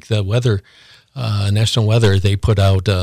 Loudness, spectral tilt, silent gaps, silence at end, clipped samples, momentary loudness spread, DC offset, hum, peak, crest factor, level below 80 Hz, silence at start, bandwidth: -16 LUFS; -6 dB/octave; none; 0 s; under 0.1%; 9 LU; under 0.1%; none; -4 dBFS; 12 dB; -30 dBFS; 0.1 s; 14 kHz